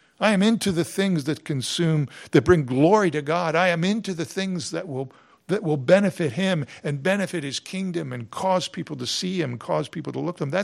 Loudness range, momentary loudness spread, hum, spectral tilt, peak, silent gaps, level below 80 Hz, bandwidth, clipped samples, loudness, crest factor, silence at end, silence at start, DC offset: 5 LU; 11 LU; none; -5.5 dB/octave; -2 dBFS; none; -58 dBFS; 16 kHz; under 0.1%; -23 LUFS; 22 dB; 0 s; 0.2 s; under 0.1%